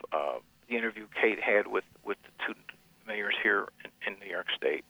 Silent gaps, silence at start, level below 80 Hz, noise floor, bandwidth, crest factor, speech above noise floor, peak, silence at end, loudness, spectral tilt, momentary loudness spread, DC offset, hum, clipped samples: none; 0.05 s; -74 dBFS; -54 dBFS; over 20 kHz; 20 dB; 23 dB; -14 dBFS; 0.1 s; -31 LUFS; -4 dB/octave; 14 LU; under 0.1%; none; under 0.1%